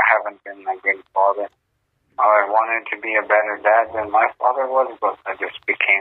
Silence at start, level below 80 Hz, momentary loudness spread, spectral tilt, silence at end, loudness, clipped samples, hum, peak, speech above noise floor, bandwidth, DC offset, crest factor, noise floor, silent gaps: 0 s; -66 dBFS; 11 LU; -6 dB/octave; 0 s; -19 LUFS; under 0.1%; none; 0 dBFS; 50 dB; 4.2 kHz; under 0.1%; 18 dB; -69 dBFS; none